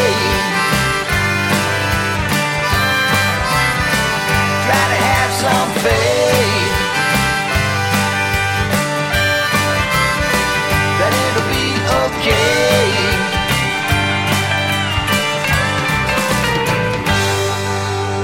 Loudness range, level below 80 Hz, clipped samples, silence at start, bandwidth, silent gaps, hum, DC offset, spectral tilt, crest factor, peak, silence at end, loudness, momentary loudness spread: 1 LU; -32 dBFS; under 0.1%; 0 s; 16.5 kHz; none; none; under 0.1%; -4 dB/octave; 14 dB; -2 dBFS; 0 s; -15 LUFS; 3 LU